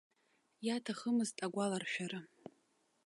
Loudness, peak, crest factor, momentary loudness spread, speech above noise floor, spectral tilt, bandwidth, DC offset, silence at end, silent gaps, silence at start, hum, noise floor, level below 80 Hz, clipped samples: -39 LUFS; -26 dBFS; 16 dB; 20 LU; 39 dB; -4.5 dB/octave; 11.5 kHz; under 0.1%; 0.55 s; none; 0.6 s; none; -77 dBFS; -88 dBFS; under 0.1%